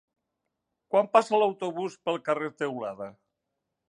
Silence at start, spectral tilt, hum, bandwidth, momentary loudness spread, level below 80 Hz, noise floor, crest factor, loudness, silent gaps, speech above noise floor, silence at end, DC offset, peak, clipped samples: 0.9 s; -5 dB/octave; none; 10.5 kHz; 14 LU; -80 dBFS; -83 dBFS; 22 dB; -27 LUFS; none; 56 dB; 0.8 s; under 0.1%; -6 dBFS; under 0.1%